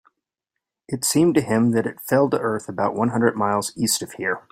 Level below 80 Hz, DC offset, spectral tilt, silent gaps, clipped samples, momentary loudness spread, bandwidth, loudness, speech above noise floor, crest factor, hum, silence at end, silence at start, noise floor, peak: -60 dBFS; under 0.1%; -4.5 dB/octave; none; under 0.1%; 7 LU; 16 kHz; -21 LUFS; 63 dB; 20 dB; none; 0.1 s; 0.9 s; -84 dBFS; -2 dBFS